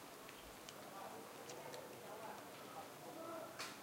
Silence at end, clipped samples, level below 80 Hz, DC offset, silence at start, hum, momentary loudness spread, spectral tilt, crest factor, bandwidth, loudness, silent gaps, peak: 0 s; under 0.1%; -80 dBFS; under 0.1%; 0 s; none; 4 LU; -3 dB/octave; 22 dB; 16.5 kHz; -53 LUFS; none; -32 dBFS